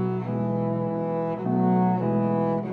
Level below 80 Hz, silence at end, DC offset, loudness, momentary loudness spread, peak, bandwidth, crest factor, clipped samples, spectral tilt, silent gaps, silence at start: -62 dBFS; 0 s; under 0.1%; -25 LUFS; 5 LU; -12 dBFS; 4.3 kHz; 12 dB; under 0.1%; -11.5 dB/octave; none; 0 s